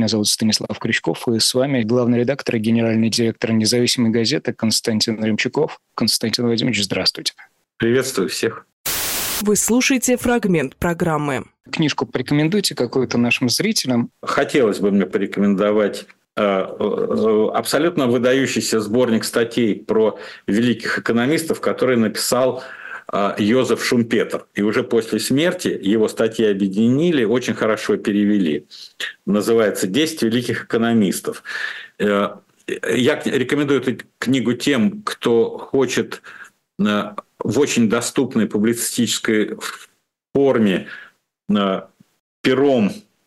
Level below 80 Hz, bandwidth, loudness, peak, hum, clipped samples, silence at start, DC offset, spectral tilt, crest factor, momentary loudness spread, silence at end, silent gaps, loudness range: -54 dBFS; 16 kHz; -19 LUFS; -4 dBFS; none; under 0.1%; 0 s; under 0.1%; -4.5 dB/octave; 14 dB; 8 LU; 0.25 s; 8.73-8.84 s, 42.20-42.44 s; 2 LU